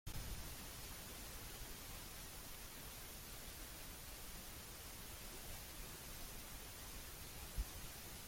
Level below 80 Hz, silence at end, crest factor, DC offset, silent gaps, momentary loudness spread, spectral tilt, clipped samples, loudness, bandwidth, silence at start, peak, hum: -56 dBFS; 0 s; 20 dB; under 0.1%; none; 2 LU; -2.5 dB/octave; under 0.1%; -51 LUFS; 16.5 kHz; 0.05 s; -32 dBFS; none